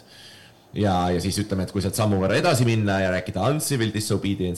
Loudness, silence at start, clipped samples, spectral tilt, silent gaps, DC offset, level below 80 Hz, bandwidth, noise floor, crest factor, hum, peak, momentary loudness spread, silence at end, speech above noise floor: -23 LUFS; 0.1 s; under 0.1%; -5.5 dB/octave; none; 0.2%; -50 dBFS; 13 kHz; -48 dBFS; 16 dB; none; -8 dBFS; 6 LU; 0 s; 26 dB